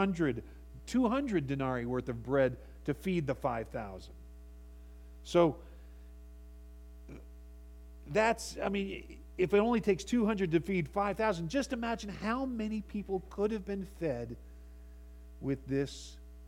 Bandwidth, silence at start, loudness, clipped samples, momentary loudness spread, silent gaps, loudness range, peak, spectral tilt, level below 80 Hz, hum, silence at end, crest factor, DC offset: 16.5 kHz; 0 s; -33 LUFS; under 0.1%; 24 LU; none; 6 LU; -14 dBFS; -6.5 dB/octave; -50 dBFS; none; 0 s; 22 dB; under 0.1%